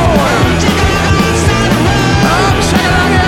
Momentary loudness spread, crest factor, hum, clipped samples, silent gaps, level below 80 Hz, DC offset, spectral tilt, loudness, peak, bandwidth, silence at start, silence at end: 1 LU; 10 dB; none; under 0.1%; none; -20 dBFS; under 0.1%; -5 dB/octave; -10 LUFS; 0 dBFS; 17 kHz; 0 s; 0 s